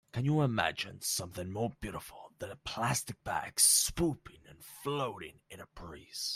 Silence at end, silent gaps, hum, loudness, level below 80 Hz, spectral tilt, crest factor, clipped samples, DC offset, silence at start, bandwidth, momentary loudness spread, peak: 0 s; none; none; -32 LUFS; -58 dBFS; -3 dB/octave; 24 dB; under 0.1%; under 0.1%; 0.15 s; 16 kHz; 23 LU; -10 dBFS